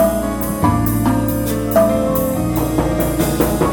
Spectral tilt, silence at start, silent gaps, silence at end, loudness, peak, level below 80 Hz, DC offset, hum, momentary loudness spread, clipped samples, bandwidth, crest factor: -6.5 dB/octave; 0 s; none; 0 s; -17 LUFS; -2 dBFS; -28 dBFS; 0.2%; none; 4 LU; under 0.1%; 17.5 kHz; 14 dB